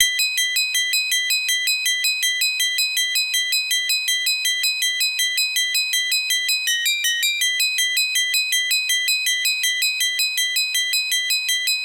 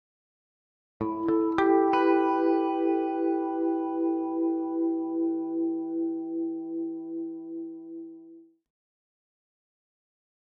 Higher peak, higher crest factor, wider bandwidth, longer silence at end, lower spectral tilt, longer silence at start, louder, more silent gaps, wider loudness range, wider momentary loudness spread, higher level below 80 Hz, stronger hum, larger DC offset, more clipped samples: first, 0 dBFS vs -10 dBFS; about the same, 20 dB vs 20 dB; first, 17 kHz vs 5.2 kHz; second, 0 s vs 2.15 s; second, 7.5 dB/octave vs -8 dB/octave; second, 0 s vs 1 s; first, -18 LUFS vs -28 LUFS; neither; second, 0 LU vs 14 LU; second, 1 LU vs 15 LU; second, -80 dBFS vs -68 dBFS; neither; neither; neither